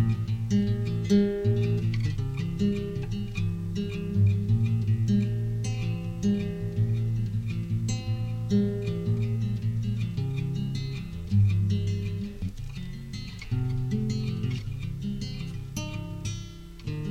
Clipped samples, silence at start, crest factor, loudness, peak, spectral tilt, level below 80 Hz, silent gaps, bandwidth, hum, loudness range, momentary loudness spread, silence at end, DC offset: under 0.1%; 0 s; 16 dB; -29 LUFS; -12 dBFS; -7.5 dB/octave; -42 dBFS; none; 8.6 kHz; none; 5 LU; 11 LU; 0 s; under 0.1%